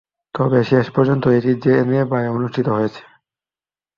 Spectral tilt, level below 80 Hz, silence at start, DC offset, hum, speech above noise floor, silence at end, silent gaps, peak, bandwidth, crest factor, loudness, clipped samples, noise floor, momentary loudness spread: -9.5 dB/octave; -56 dBFS; 0.35 s; under 0.1%; none; over 74 dB; 1 s; none; -2 dBFS; 6.8 kHz; 16 dB; -17 LUFS; under 0.1%; under -90 dBFS; 6 LU